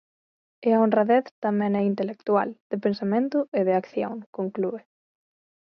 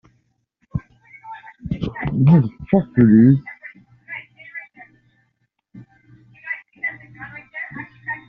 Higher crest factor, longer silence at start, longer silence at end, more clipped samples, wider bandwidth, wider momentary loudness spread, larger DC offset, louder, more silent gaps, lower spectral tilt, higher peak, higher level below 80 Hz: about the same, 18 dB vs 18 dB; second, 0.6 s vs 0.75 s; first, 1 s vs 0.1 s; neither; first, 6 kHz vs 4.4 kHz; second, 10 LU vs 24 LU; neither; second, -25 LUFS vs -18 LUFS; first, 1.31-1.42 s, 2.60-2.70 s, 3.48-3.52 s, 4.26-4.33 s vs none; about the same, -9.5 dB/octave vs -9 dB/octave; second, -8 dBFS vs -2 dBFS; second, -74 dBFS vs -48 dBFS